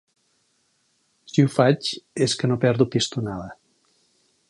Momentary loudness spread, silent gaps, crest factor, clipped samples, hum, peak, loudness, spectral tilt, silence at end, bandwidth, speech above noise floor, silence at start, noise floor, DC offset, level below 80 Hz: 12 LU; none; 20 dB; under 0.1%; none; -4 dBFS; -22 LUFS; -5.5 dB/octave; 0.95 s; 11.5 kHz; 47 dB; 1.35 s; -68 dBFS; under 0.1%; -58 dBFS